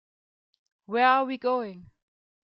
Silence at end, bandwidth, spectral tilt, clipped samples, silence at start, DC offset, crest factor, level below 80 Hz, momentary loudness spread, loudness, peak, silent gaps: 0.75 s; 5.8 kHz; -7.5 dB/octave; under 0.1%; 0.9 s; under 0.1%; 20 dB; -74 dBFS; 10 LU; -25 LUFS; -8 dBFS; none